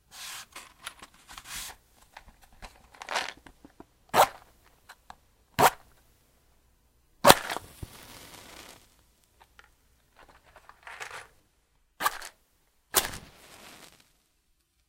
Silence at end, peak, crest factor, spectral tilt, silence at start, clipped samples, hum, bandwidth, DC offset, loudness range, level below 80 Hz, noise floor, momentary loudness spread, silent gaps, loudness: 1.7 s; 0 dBFS; 34 dB; -2 dB/octave; 0.15 s; under 0.1%; none; 16.5 kHz; under 0.1%; 21 LU; -58 dBFS; -71 dBFS; 26 LU; none; -27 LUFS